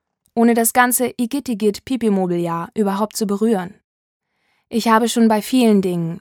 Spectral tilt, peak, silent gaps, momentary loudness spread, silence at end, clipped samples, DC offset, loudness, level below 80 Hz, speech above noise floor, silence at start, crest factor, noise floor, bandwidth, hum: -4.5 dB/octave; 0 dBFS; 3.84-4.20 s; 8 LU; 0 s; under 0.1%; under 0.1%; -18 LUFS; -60 dBFS; 50 dB; 0.35 s; 18 dB; -67 dBFS; 19 kHz; none